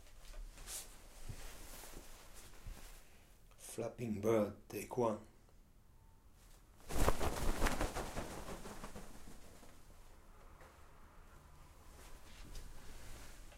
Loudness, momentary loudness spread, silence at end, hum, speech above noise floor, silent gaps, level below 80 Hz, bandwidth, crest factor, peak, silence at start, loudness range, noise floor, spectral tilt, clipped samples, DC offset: -42 LUFS; 24 LU; 0 s; none; 25 dB; none; -48 dBFS; 16 kHz; 26 dB; -16 dBFS; 0 s; 18 LU; -63 dBFS; -5 dB/octave; under 0.1%; under 0.1%